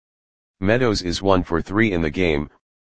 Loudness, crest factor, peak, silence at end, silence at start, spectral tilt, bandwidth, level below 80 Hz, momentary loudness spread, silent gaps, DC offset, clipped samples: -20 LUFS; 20 dB; 0 dBFS; 0.2 s; 0.55 s; -6 dB/octave; 9.6 kHz; -38 dBFS; 6 LU; none; 2%; under 0.1%